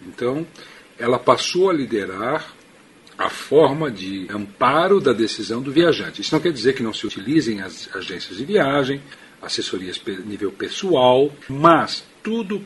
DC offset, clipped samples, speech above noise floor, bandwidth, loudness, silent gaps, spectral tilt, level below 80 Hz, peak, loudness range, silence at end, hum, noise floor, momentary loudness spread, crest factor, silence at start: under 0.1%; under 0.1%; 29 dB; 11.5 kHz; -20 LUFS; none; -5 dB/octave; -58 dBFS; 0 dBFS; 4 LU; 0 s; none; -49 dBFS; 13 LU; 20 dB; 0 s